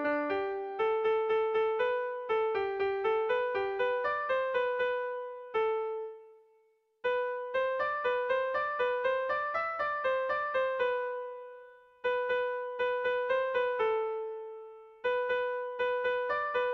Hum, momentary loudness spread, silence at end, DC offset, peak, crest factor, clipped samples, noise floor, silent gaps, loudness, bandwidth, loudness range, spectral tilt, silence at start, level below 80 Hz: none; 8 LU; 0 s; under 0.1%; -20 dBFS; 12 dB; under 0.1%; -69 dBFS; none; -32 LUFS; 6 kHz; 3 LU; -5 dB/octave; 0 s; -70 dBFS